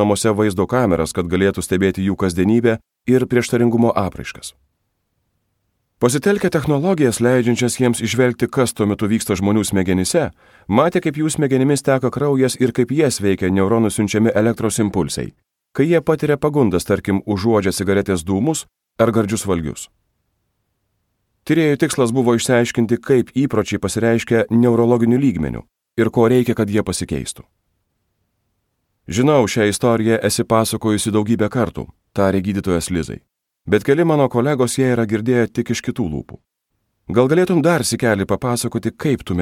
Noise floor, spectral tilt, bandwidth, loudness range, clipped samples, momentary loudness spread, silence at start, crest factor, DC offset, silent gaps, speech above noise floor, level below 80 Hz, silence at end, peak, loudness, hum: -72 dBFS; -5.5 dB/octave; 16.5 kHz; 4 LU; under 0.1%; 9 LU; 0 s; 16 dB; under 0.1%; none; 55 dB; -46 dBFS; 0 s; 0 dBFS; -17 LUFS; none